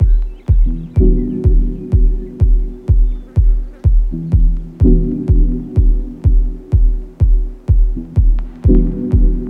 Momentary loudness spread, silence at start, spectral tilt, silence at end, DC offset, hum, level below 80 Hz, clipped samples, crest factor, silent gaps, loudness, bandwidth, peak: 4 LU; 0 s; -12 dB/octave; 0 s; under 0.1%; none; -12 dBFS; under 0.1%; 12 dB; none; -16 LUFS; 1.3 kHz; 0 dBFS